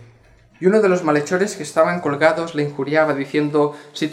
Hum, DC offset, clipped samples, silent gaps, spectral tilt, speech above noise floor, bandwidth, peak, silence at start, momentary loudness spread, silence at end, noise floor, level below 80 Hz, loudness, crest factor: none; under 0.1%; under 0.1%; none; -5.5 dB/octave; 33 dB; 13.5 kHz; -2 dBFS; 0 s; 7 LU; 0 s; -51 dBFS; -64 dBFS; -18 LUFS; 18 dB